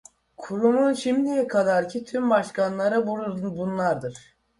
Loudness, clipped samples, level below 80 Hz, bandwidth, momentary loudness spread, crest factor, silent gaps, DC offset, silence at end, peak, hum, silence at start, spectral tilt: -24 LUFS; under 0.1%; -64 dBFS; 11.5 kHz; 9 LU; 16 dB; none; under 0.1%; 0.4 s; -8 dBFS; none; 0.4 s; -6 dB/octave